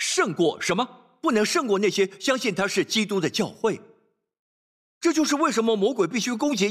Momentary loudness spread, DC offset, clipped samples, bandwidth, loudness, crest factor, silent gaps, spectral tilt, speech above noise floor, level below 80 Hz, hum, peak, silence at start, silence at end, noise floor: 5 LU; under 0.1%; under 0.1%; 15 kHz; -24 LUFS; 14 dB; 4.39-5.01 s; -3.5 dB/octave; over 67 dB; -70 dBFS; none; -10 dBFS; 0 s; 0 s; under -90 dBFS